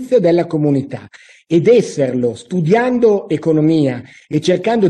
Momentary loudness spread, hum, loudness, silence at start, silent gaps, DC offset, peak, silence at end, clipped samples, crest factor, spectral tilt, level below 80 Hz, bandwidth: 8 LU; none; -15 LUFS; 0 s; none; under 0.1%; -2 dBFS; 0 s; under 0.1%; 12 dB; -7 dB/octave; -56 dBFS; 10.5 kHz